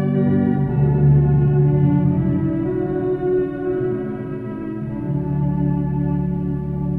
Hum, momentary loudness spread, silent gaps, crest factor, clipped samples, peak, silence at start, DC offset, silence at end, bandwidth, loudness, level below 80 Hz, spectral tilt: none; 11 LU; none; 14 dB; under 0.1%; -6 dBFS; 0 s; under 0.1%; 0 s; 3.1 kHz; -19 LUFS; -36 dBFS; -12.5 dB/octave